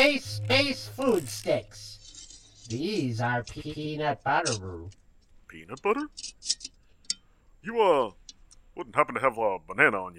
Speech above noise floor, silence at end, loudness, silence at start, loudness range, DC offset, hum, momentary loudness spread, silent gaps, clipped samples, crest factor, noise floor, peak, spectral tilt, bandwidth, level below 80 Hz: 30 dB; 0 s; -28 LUFS; 0 s; 4 LU; under 0.1%; none; 20 LU; none; under 0.1%; 24 dB; -58 dBFS; -6 dBFS; -4 dB/octave; 16 kHz; -58 dBFS